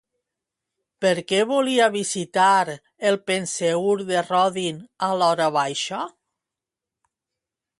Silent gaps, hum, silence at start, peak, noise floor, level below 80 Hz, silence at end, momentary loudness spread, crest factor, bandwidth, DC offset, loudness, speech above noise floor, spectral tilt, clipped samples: none; none; 1 s; -6 dBFS; -87 dBFS; -72 dBFS; 1.7 s; 10 LU; 16 dB; 11.5 kHz; under 0.1%; -22 LUFS; 66 dB; -3.5 dB/octave; under 0.1%